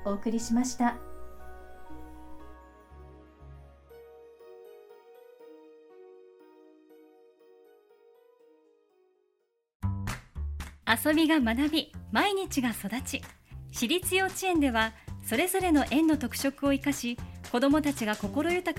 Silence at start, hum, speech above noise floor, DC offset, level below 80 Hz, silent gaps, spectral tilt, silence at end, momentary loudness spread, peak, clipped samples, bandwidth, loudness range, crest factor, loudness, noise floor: 0 s; none; 48 dB; under 0.1%; -48 dBFS; 9.75-9.80 s; -4 dB/octave; 0 s; 24 LU; -8 dBFS; under 0.1%; 16.5 kHz; 19 LU; 22 dB; -28 LUFS; -76 dBFS